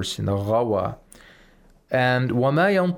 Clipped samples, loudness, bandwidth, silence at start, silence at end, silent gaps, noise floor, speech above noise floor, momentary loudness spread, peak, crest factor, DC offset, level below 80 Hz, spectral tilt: under 0.1%; -22 LUFS; 16.5 kHz; 0 s; 0 s; none; -54 dBFS; 33 dB; 8 LU; -10 dBFS; 14 dB; under 0.1%; -54 dBFS; -6 dB/octave